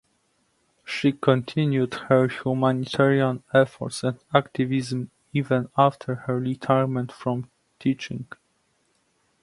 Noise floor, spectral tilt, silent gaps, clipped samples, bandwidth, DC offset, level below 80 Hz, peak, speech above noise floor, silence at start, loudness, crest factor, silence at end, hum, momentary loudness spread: -69 dBFS; -7 dB/octave; none; under 0.1%; 11.5 kHz; under 0.1%; -64 dBFS; -2 dBFS; 45 dB; 0.85 s; -24 LUFS; 22 dB; 1.2 s; none; 10 LU